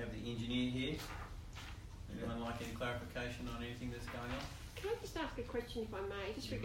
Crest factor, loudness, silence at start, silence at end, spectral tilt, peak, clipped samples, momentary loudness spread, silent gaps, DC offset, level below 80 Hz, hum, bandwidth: 16 dB; -44 LUFS; 0 s; 0 s; -5.5 dB/octave; -26 dBFS; under 0.1%; 11 LU; none; under 0.1%; -52 dBFS; none; 16 kHz